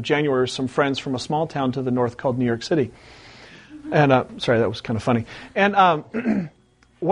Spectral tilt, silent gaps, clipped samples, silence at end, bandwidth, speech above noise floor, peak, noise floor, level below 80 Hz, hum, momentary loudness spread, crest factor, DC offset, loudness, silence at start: -6 dB/octave; none; under 0.1%; 0 s; 10.5 kHz; 23 dB; -2 dBFS; -44 dBFS; -54 dBFS; none; 9 LU; 20 dB; under 0.1%; -22 LUFS; 0 s